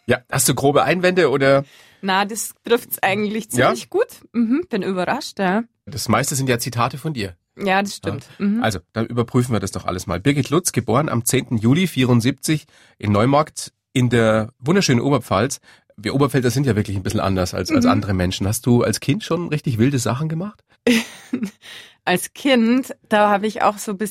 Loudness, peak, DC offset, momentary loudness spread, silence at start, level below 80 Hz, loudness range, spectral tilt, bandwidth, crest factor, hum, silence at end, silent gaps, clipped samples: -19 LUFS; -2 dBFS; under 0.1%; 10 LU; 0.1 s; -50 dBFS; 3 LU; -5 dB/octave; 16 kHz; 16 dB; none; 0 s; none; under 0.1%